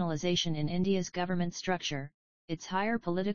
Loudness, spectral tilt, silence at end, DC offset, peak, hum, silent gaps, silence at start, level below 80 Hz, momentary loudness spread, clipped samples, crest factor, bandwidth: -32 LUFS; -5 dB/octave; 0 s; 0.6%; -16 dBFS; none; 2.14-2.48 s; 0 s; -58 dBFS; 10 LU; under 0.1%; 16 dB; 7.2 kHz